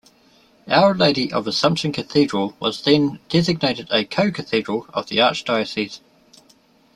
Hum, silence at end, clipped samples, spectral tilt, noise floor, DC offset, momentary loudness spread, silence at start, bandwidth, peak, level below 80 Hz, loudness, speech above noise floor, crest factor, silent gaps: none; 1 s; under 0.1%; -5.5 dB/octave; -55 dBFS; under 0.1%; 8 LU; 0.65 s; 12.5 kHz; 0 dBFS; -58 dBFS; -19 LUFS; 36 dB; 20 dB; none